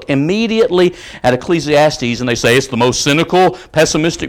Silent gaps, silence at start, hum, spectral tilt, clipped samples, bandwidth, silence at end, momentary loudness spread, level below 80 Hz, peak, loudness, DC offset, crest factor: none; 0 s; none; -4.5 dB/octave; under 0.1%; 18 kHz; 0 s; 4 LU; -40 dBFS; -2 dBFS; -13 LUFS; under 0.1%; 12 dB